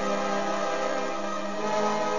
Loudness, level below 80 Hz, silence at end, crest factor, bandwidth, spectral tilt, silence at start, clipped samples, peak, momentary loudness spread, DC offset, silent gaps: -28 LUFS; -68 dBFS; 0 s; 12 dB; 7.4 kHz; -4 dB/octave; 0 s; under 0.1%; -14 dBFS; 4 LU; 2%; none